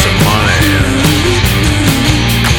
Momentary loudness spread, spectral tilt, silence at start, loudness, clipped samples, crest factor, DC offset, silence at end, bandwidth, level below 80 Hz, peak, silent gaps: 1 LU; -4.5 dB/octave; 0 s; -10 LUFS; under 0.1%; 10 dB; under 0.1%; 0 s; 19.5 kHz; -20 dBFS; 0 dBFS; none